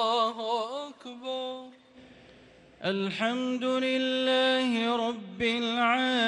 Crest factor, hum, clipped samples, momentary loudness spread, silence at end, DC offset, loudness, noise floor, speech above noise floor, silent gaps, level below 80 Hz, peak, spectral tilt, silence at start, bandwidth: 16 dB; none; under 0.1%; 12 LU; 0 s; under 0.1%; -28 LUFS; -55 dBFS; 27 dB; none; -68 dBFS; -14 dBFS; -4 dB/octave; 0 s; 10.5 kHz